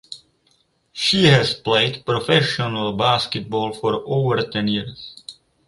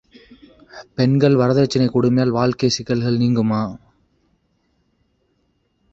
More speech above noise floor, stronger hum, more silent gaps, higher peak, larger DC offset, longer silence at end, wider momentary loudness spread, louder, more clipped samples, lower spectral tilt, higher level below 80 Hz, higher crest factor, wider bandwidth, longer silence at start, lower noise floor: second, 43 dB vs 49 dB; neither; neither; about the same, -2 dBFS vs -2 dBFS; neither; second, 0.35 s vs 2.15 s; first, 21 LU vs 6 LU; about the same, -19 LUFS vs -18 LUFS; neither; second, -5 dB/octave vs -6.5 dB/octave; about the same, -52 dBFS vs -52 dBFS; about the same, 20 dB vs 16 dB; first, 11.5 kHz vs 7.8 kHz; second, 0.1 s vs 0.75 s; about the same, -63 dBFS vs -66 dBFS